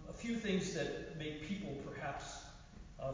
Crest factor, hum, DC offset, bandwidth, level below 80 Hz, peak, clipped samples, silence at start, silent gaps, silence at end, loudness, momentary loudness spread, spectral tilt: 18 dB; none; under 0.1%; 7.6 kHz; -58 dBFS; -24 dBFS; under 0.1%; 0 s; none; 0 s; -42 LUFS; 15 LU; -5 dB/octave